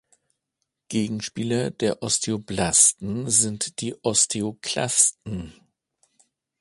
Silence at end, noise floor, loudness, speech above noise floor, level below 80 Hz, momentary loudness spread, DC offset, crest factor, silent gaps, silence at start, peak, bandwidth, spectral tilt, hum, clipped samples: 1.1 s; -80 dBFS; -21 LUFS; 56 dB; -54 dBFS; 13 LU; under 0.1%; 22 dB; none; 0.9 s; -4 dBFS; 11.5 kHz; -2.5 dB/octave; none; under 0.1%